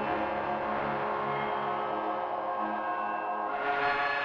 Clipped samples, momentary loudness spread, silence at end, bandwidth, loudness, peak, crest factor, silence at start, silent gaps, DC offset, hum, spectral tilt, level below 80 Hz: under 0.1%; 4 LU; 0 s; 6.8 kHz; -31 LUFS; -16 dBFS; 16 dB; 0 s; none; under 0.1%; none; -6.5 dB/octave; -62 dBFS